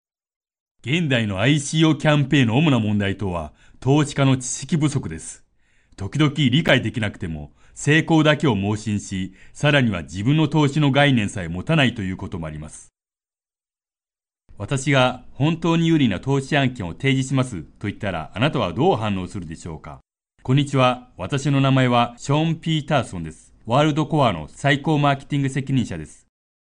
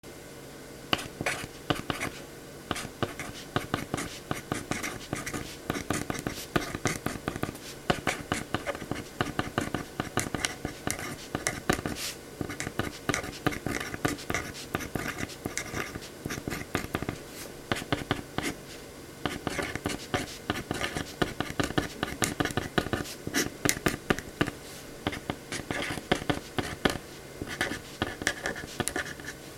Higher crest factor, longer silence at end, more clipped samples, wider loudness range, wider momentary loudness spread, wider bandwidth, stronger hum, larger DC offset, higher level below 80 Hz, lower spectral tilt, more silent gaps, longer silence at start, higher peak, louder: second, 18 dB vs 34 dB; first, 0.65 s vs 0 s; neither; about the same, 4 LU vs 4 LU; first, 15 LU vs 8 LU; second, 10.5 kHz vs 17.5 kHz; neither; neither; about the same, -48 dBFS vs -50 dBFS; first, -6 dB/octave vs -3.5 dB/octave; neither; first, 0.85 s vs 0.05 s; second, -4 dBFS vs 0 dBFS; first, -20 LUFS vs -33 LUFS